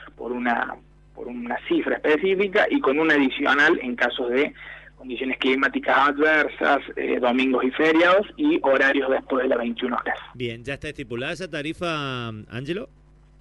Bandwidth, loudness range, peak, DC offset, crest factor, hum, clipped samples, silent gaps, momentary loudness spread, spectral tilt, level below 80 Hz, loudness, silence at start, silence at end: 11.5 kHz; 7 LU; -8 dBFS; under 0.1%; 16 dB; none; under 0.1%; none; 14 LU; -5.5 dB/octave; -54 dBFS; -22 LUFS; 0 s; 0.55 s